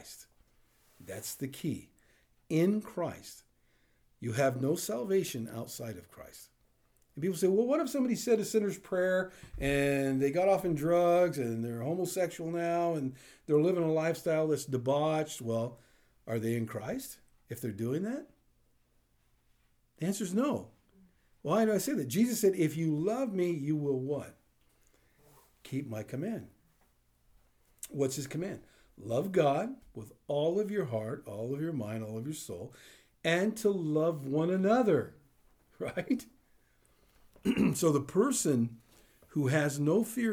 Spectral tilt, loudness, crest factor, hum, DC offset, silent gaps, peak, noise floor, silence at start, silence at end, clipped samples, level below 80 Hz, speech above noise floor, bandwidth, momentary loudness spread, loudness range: -6 dB/octave; -32 LUFS; 18 dB; 60 Hz at -65 dBFS; under 0.1%; none; -14 dBFS; -71 dBFS; 0 s; 0 s; under 0.1%; -62 dBFS; 39 dB; over 20 kHz; 14 LU; 9 LU